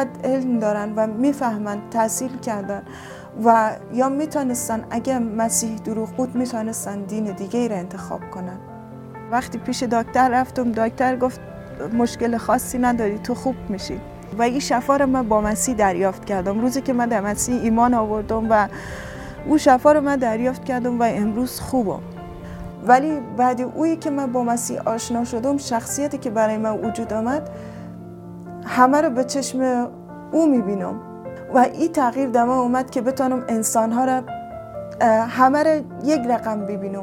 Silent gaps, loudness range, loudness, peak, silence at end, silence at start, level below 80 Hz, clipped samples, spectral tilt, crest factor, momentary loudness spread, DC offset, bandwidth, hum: none; 4 LU; -21 LUFS; -2 dBFS; 0 s; 0 s; -48 dBFS; under 0.1%; -5 dB/octave; 20 dB; 16 LU; under 0.1%; 17 kHz; none